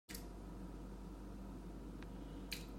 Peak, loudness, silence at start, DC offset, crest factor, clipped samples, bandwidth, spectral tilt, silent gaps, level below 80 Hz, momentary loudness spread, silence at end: -28 dBFS; -52 LUFS; 0.1 s; under 0.1%; 22 dB; under 0.1%; 16 kHz; -4.5 dB/octave; none; -54 dBFS; 4 LU; 0 s